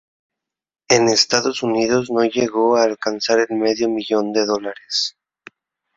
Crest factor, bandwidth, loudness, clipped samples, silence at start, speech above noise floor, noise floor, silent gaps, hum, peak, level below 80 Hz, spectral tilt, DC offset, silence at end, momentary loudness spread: 20 dB; 7.8 kHz; -18 LUFS; under 0.1%; 0.9 s; 29 dB; -47 dBFS; none; none; 0 dBFS; -60 dBFS; -3 dB/octave; under 0.1%; 0.85 s; 7 LU